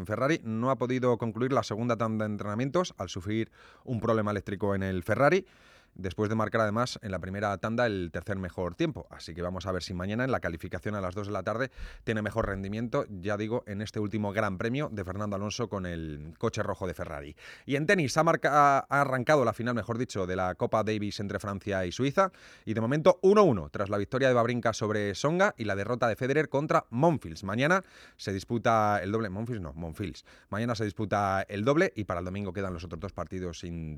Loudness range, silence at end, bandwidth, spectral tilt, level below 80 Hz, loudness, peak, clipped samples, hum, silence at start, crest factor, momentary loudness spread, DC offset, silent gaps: 6 LU; 0 s; 15 kHz; -6 dB/octave; -54 dBFS; -29 LUFS; -8 dBFS; under 0.1%; none; 0 s; 20 dB; 12 LU; under 0.1%; none